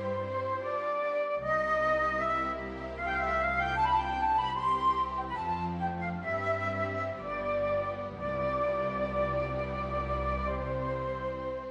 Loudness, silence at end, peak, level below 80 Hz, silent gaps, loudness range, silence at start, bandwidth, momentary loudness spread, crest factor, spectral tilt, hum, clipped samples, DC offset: -31 LUFS; 0 s; -18 dBFS; -46 dBFS; none; 3 LU; 0 s; 9.8 kHz; 7 LU; 14 dB; -7 dB/octave; none; under 0.1%; under 0.1%